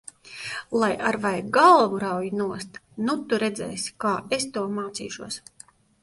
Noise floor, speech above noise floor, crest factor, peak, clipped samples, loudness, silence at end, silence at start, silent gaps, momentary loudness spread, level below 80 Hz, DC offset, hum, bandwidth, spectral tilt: -53 dBFS; 29 dB; 22 dB; -4 dBFS; under 0.1%; -24 LUFS; 0.65 s; 0.25 s; none; 18 LU; -64 dBFS; under 0.1%; none; 11.5 kHz; -4 dB/octave